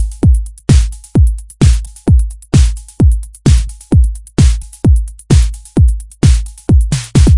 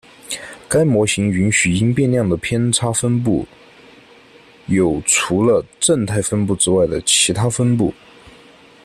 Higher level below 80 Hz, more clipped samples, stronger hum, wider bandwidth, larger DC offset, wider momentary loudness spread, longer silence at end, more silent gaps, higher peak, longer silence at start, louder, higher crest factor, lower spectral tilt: first, -12 dBFS vs -46 dBFS; first, 0.2% vs under 0.1%; neither; second, 11.5 kHz vs 14 kHz; first, 0.2% vs under 0.1%; second, 3 LU vs 8 LU; second, 0 s vs 0.95 s; neither; about the same, 0 dBFS vs 0 dBFS; second, 0 s vs 0.25 s; first, -13 LUFS vs -16 LUFS; second, 10 dB vs 16 dB; first, -6.5 dB/octave vs -4 dB/octave